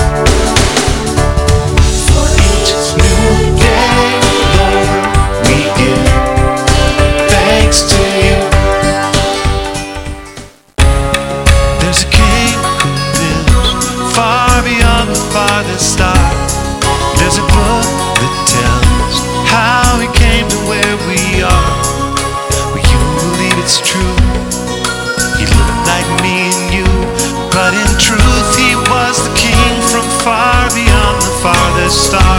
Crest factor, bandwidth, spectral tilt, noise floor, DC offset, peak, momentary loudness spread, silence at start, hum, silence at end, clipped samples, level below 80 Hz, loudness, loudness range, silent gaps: 10 dB; 17 kHz; -4 dB/octave; -32 dBFS; under 0.1%; 0 dBFS; 5 LU; 0 s; none; 0 s; 0.4%; -16 dBFS; -10 LUFS; 3 LU; none